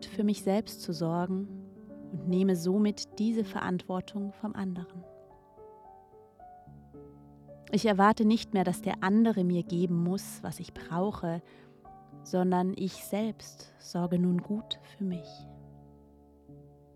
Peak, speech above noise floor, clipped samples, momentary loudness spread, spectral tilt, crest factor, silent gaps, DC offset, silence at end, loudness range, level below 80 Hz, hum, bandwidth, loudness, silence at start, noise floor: -10 dBFS; 28 dB; under 0.1%; 22 LU; -6.5 dB/octave; 22 dB; none; under 0.1%; 0.3 s; 10 LU; -64 dBFS; none; 14.5 kHz; -31 LUFS; 0 s; -58 dBFS